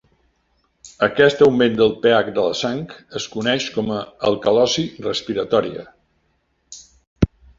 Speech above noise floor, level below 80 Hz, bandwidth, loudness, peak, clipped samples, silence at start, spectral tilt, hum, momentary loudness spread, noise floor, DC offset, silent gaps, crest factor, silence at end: 48 dB; -42 dBFS; 7.6 kHz; -19 LUFS; 0 dBFS; under 0.1%; 0.85 s; -5 dB/octave; none; 15 LU; -66 dBFS; under 0.1%; 7.07-7.16 s; 18 dB; 0.3 s